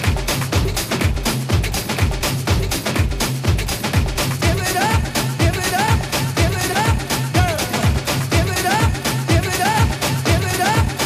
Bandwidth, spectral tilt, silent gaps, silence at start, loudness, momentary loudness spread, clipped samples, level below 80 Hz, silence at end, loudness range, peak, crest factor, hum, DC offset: 15.5 kHz; -4.5 dB/octave; none; 0 s; -18 LUFS; 3 LU; under 0.1%; -26 dBFS; 0 s; 2 LU; -2 dBFS; 16 dB; none; under 0.1%